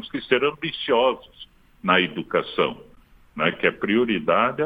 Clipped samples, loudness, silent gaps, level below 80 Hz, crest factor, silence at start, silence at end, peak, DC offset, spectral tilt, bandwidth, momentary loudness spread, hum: under 0.1%; -22 LUFS; none; -56 dBFS; 20 dB; 0 s; 0 s; -4 dBFS; under 0.1%; -7.5 dB/octave; 5 kHz; 9 LU; none